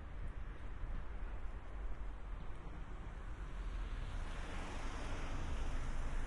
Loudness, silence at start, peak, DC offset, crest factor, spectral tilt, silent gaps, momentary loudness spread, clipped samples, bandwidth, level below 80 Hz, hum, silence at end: -48 LUFS; 0 s; -30 dBFS; under 0.1%; 12 dB; -5.5 dB/octave; none; 6 LU; under 0.1%; 11 kHz; -44 dBFS; none; 0 s